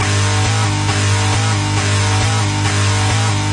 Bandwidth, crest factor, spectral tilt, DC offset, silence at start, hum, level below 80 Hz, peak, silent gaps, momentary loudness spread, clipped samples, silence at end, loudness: 11.5 kHz; 10 dB; -4 dB/octave; under 0.1%; 0 s; 50 Hz at -20 dBFS; -36 dBFS; -4 dBFS; none; 1 LU; under 0.1%; 0 s; -15 LUFS